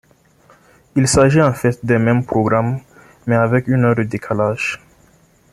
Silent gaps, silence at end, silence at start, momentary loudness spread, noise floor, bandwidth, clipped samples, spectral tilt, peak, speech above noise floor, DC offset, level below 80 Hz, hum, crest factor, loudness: none; 0.75 s; 0.95 s; 10 LU; -52 dBFS; 13.5 kHz; under 0.1%; -6 dB/octave; -2 dBFS; 37 dB; under 0.1%; -44 dBFS; none; 16 dB; -16 LUFS